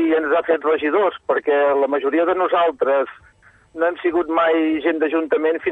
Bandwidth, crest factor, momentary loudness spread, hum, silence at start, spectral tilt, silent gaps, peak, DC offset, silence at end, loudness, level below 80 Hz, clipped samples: 4 kHz; 12 dB; 4 LU; none; 0 s; -6.5 dB/octave; none; -6 dBFS; under 0.1%; 0 s; -19 LUFS; -60 dBFS; under 0.1%